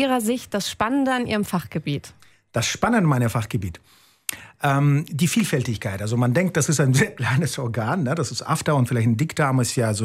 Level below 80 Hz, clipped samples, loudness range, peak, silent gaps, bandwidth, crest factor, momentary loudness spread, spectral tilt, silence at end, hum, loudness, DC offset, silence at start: -54 dBFS; under 0.1%; 3 LU; -4 dBFS; none; 16 kHz; 18 dB; 9 LU; -5.5 dB/octave; 0 s; none; -22 LUFS; under 0.1%; 0 s